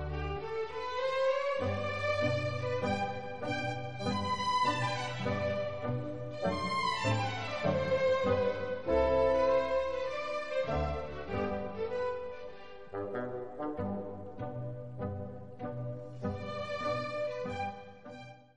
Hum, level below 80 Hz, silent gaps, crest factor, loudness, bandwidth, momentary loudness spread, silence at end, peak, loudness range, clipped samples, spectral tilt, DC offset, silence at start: none; -52 dBFS; none; 16 dB; -34 LUFS; 10.5 kHz; 12 LU; 0 s; -18 dBFS; 9 LU; under 0.1%; -6 dB/octave; 0.4%; 0 s